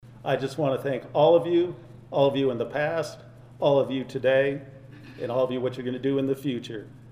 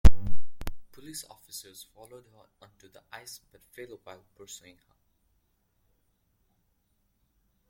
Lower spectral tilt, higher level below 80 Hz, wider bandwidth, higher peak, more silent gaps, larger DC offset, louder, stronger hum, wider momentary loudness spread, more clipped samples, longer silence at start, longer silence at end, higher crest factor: first, -7 dB/octave vs -5.5 dB/octave; second, -62 dBFS vs -34 dBFS; about the same, 15 kHz vs 16.5 kHz; second, -8 dBFS vs -2 dBFS; neither; neither; first, -25 LUFS vs -39 LUFS; neither; about the same, 15 LU vs 14 LU; neither; about the same, 0.05 s vs 0.05 s; second, 0 s vs 6.5 s; about the same, 18 dB vs 22 dB